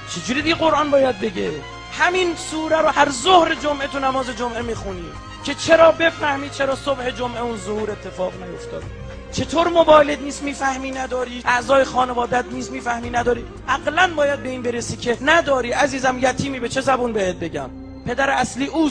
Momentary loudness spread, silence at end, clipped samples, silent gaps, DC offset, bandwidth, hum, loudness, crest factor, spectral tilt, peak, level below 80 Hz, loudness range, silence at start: 14 LU; 0 s; under 0.1%; none; under 0.1%; 10.5 kHz; none; -19 LUFS; 20 dB; -4 dB/octave; 0 dBFS; -42 dBFS; 3 LU; 0 s